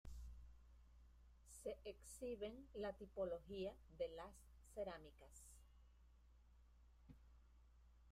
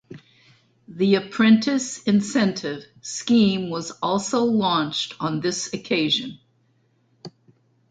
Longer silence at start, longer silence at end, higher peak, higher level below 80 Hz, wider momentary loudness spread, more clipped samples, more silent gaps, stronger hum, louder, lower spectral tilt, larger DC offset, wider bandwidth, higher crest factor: about the same, 0.05 s vs 0.1 s; second, 0 s vs 0.6 s; second, -34 dBFS vs -6 dBFS; about the same, -66 dBFS vs -64 dBFS; first, 18 LU vs 12 LU; neither; neither; neither; second, -53 LUFS vs -22 LUFS; about the same, -5 dB/octave vs -4.5 dB/octave; neither; first, 15.5 kHz vs 9.2 kHz; about the same, 20 dB vs 18 dB